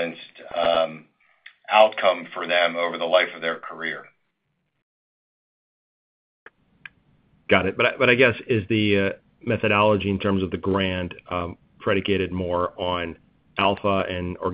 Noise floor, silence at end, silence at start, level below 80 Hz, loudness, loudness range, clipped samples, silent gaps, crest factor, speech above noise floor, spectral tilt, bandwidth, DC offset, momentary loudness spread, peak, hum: -74 dBFS; 0 s; 0 s; -56 dBFS; -22 LUFS; 8 LU; under 0.1%; 4.83-6.46 s; 24 dB; 52 dB; -8.5 dB/octave; 5.2 kHz; under 0.1%; 12 LU; 0 dBFS; none